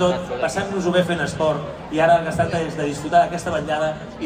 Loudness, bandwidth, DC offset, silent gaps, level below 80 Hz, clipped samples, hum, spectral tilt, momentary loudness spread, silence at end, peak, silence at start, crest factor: -21 LUFS; 15.5 kHz; under 0.1%; none; -46 dBFS; under 0.1%; none; -5.5 dB/octave; 8 LU; 0 s; -4 dBFS; 0 s; 16 dB